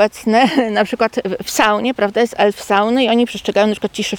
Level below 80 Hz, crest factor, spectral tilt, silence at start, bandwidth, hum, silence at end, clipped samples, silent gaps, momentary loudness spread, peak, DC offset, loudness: -52 dBFS; 14 dB; -4 dB/octave; 0 s; 19 kHz; none; 0 s; under 0.1%; none; 4 LU; 0 dBFS; under 0.1%; -15 LUFS